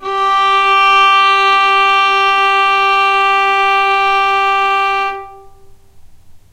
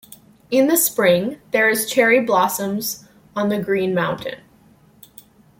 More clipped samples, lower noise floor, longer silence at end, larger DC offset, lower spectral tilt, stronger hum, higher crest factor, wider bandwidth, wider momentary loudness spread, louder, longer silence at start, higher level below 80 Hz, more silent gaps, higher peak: neither; second, -39 dBFS vs -52 dBFS; second, 0.15 s vs 1.25 s; neither; second, -1 dB/octave vs -3.5 dB/octave; neither; second, 12 dB vs 18 dB; about the same, 15.5 kHz vs 17 kHz; second, 5 LU vs 13 LU; first, -10 LUFS vs -18 LUFS; second, 0 s vs 0.5 s; first, -48 dBFS vs -60 dBFS; neither; about the same, -2 dBFS vs -2 dBFS